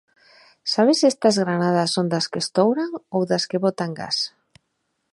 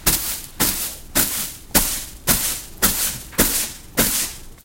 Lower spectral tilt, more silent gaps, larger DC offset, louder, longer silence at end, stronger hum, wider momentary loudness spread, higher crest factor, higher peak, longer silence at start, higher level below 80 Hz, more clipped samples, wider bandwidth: first, -4.5 dB/octave vs -1.5 dB/octave; neither; neither; about the same, -21 LUFS vs -19 LUFS; first, 0.85 s vs 0.05 s; neither; first, 9 LU vs 6 LU; about the same, 18 dB vs 22 dB; second, -4 dBFS vs 0 dBFS; first, 0.65 s vs 0 s; second, -68 dBFS vs -34 dBFS; neither; second, 11.5 kHz vs 17 kHz